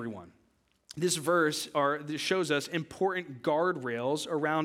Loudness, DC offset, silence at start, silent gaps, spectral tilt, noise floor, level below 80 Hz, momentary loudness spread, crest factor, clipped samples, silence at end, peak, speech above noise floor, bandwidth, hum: -30 LUFS; under 0.1%; 0 s; none; -4 dB/octave; -70 dBFS; -74 dBFS; 7 LU; 18 dB; under 0.1%; 0 s; -12 dBFS; 40 dB; 17 kHz; none